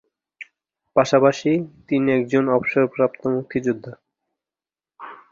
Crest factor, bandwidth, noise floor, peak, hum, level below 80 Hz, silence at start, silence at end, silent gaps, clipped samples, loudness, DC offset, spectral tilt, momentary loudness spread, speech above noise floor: 20 dB; 7.6 kHz; under -90 dBFS; -2 dBFS; none; -62 dBFS; 0.4 s; 0.15 s; none; under 0.1%; -20 LUFS; under 0.1%; -6.5 dB/octave; 24 LU; over 71 dB